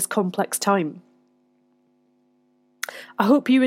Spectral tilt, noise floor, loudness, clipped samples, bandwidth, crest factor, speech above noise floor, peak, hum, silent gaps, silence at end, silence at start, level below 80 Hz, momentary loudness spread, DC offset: -4.5 dB/octave; -64 dBFS; -23 LUFS; under 0.1%; 16.5 kHz; 20 dB; 43 dB; -4 dBFS; none; none; 0 s; 0 s; -80 dBFS; 14 LU; under 0.1%